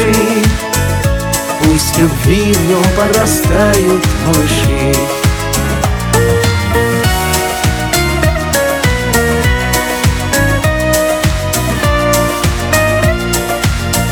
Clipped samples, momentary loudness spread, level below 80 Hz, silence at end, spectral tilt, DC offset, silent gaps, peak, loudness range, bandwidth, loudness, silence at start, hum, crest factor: under 0.1%; 4 LU; -20 dBFS; 0 s; -4.5 dB/octave; under 0.1%; none; 0 dBFS; 2 LU; over 20 kHz; -12 LUFS; 0 s; none; 12 dB